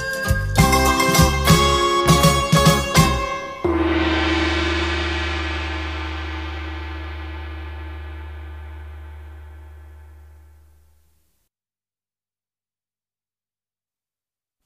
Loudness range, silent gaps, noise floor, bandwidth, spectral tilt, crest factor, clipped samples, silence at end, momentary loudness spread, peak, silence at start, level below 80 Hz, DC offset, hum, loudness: 22 LU; none; under -90 dBFS; 15.5 kHz; -4.5 dB/octave; 20 dB; under 0.1%; 4.4 s; 21 LU; -2 dBFS; 0 s; -30 dBFS; 0.2%; 50 Hz at -50 dBFS; -18 LUFS